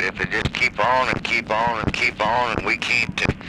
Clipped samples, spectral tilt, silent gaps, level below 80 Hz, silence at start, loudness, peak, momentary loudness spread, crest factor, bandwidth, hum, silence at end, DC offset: under 0.1%; -4.5 dB/octave; none; -40 dBFS; 0 s; -20 LUFS; -2 dBFS; 3 LU; 18 dB; 14.5 kHz; none; 0 s; under 0.1%